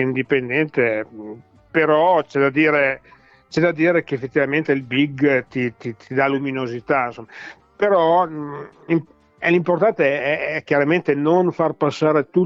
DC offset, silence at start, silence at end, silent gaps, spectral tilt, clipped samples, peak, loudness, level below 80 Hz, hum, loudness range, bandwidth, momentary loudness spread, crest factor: under 0.1%; 0 s; 0 s; none; -7.5 dB/octave; under 0.1%; -6 dBFS; -19 LUFS; -62 dBFS; none; 3 LU; 7.6 kHz; 13 LU; 14 dB